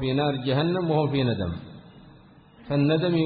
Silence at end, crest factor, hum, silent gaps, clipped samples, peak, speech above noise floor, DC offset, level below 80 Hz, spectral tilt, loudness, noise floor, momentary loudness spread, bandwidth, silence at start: 0 s; 14 dB; none; none; under 0.1%; -10 dBFS; 28 dB; under 0.1%; -48 dBFS; -11.5 dB/octave; -25 LUFS; -51 dBFS; 10 LU; 4.8 kHz; 0 s